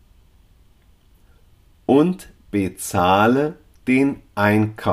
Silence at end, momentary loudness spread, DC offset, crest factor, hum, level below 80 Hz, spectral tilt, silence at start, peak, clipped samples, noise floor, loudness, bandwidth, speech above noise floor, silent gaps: 0 s; 11 LU; under 0.1%; 18 dB; none; -52 dBFS; -6 dB/octave; 1.9 s; -2 dBFS; under 0.1%; -53 dBFS; -19 LUFS; 15.5 kHz; 36 dB; none